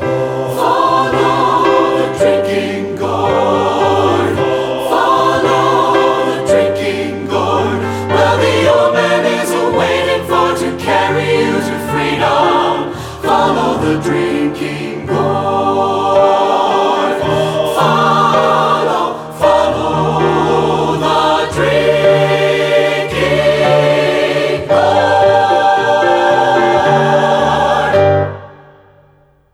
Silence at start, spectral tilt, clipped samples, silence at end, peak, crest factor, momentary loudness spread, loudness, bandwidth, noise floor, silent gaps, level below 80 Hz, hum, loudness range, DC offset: 0 s; -5.5 dB/octave; under 0.1%; 1 s; 0 dBFS; 12 dB; 6 LU; -12 LUFS; 16.5 kHz; -49 dBFS; none; -42 dBFS; none; 3 LU; under 0.1%